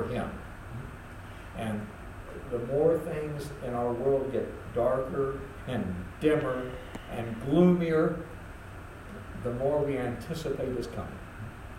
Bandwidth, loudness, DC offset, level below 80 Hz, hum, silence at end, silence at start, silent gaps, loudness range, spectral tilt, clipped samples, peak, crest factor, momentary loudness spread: 16 kHz; -30 LUFS; under 0.1%; -48 dBFS; none; 0 s; 0 s; none; 5 LU; -7.5 dB/octave; under 0.1%; -10 dBFS; 20 dB; 17 LU